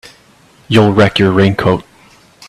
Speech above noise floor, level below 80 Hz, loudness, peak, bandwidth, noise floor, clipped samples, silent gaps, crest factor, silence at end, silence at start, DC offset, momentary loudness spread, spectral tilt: 36 dB; -42 dBFS; -11 LUFS; 0 dBFS; 12.5 kHz; -46 dBFS; under 0.1%; none; 14 dB; 0.65 s; 0.7 s; under 0.1%; 6 LU; -7 dB/octave